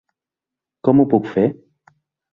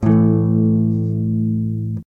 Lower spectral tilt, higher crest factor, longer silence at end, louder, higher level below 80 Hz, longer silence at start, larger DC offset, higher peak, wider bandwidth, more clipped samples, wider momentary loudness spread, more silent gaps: second, -10.5 dB/octave vs -12.5 dB/octave; first, 18 dB vs 12 dB; first, 0.8 s vs 0.05 s; about the same, -17 LUFS vs -18 LUFS; second, -56 dBFS vs -44 dBFS; first, 0.85 s vs 0 s; neither; about the same, -2 dBFS vs -4 dBFS; first, 4.1 kHz vs 2.5 kHz; neither; about the same, 7 LU vs 8 LU; neither